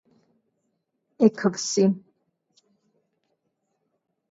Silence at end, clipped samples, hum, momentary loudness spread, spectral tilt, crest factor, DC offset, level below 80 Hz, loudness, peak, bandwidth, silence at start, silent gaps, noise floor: 2.35 s; under 0.1%; none; 5 LU; -5 dB/octave; 22 dB; under 0.1%; -76 dBFS; -23 LUFS; -6 dBFS; 8 kHz; 1.2 s; none; -76 dBFS